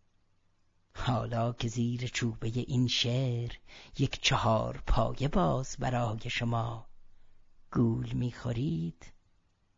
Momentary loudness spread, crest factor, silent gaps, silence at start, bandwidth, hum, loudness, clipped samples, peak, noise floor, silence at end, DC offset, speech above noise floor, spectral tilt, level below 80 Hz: 9 LU; 20 dB; none; 0.95 s; 7.8 kHz; none; -32 LUFS; under 0.1%; -12 dBFS; -69 dBFS; 0.65 s; under 0.1%; 38 dB; -5.5 dB/octave; -44 dBFS